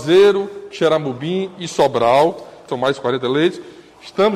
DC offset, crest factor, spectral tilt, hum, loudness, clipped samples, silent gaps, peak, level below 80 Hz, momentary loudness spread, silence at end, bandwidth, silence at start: under 0.1%; 14 dB; -5.5 dB/octave; none; -17 LUFS; under 0.1%; none; -4 dBFS; -58 dBFS; 15 LU; 0 s; 12 kHz; 0 s